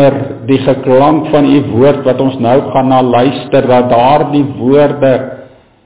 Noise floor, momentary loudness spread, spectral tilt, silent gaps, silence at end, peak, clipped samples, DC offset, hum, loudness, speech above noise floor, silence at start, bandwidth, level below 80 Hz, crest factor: -35 dBFS; 4 LU; -11.5 dB/octave; none; 0.4 s; 0 dBFS; 0.2%; 1%; none; -9 LUFS; 26 dB; 0 s; 4 kHz; -42 dBFS; 10 dB